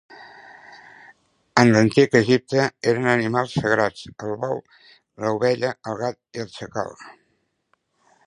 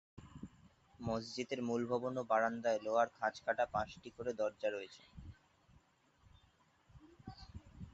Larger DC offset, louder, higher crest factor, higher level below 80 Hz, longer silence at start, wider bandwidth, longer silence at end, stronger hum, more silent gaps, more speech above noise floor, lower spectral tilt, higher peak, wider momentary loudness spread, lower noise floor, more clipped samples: neither; first, -21 LUFS vs -39 LUFS; about the same, 22 dB vs 22 dB; first, -58 dBFS vs -64 dBFS; about the same, 0.1 s vs 0.15 s; first, 11 kHz vs 8 kHz; first, 1.15 s vs 0.05 s; neither; neither; first, 49 dB vs 34 dB; first, -6 dB/octave vs -4 dB/octave; first, 0 dBFS vs -20 dBFS; second, 16 LU vs 21 LU; about the same, -70 dBFS vs -72 dBFS; neither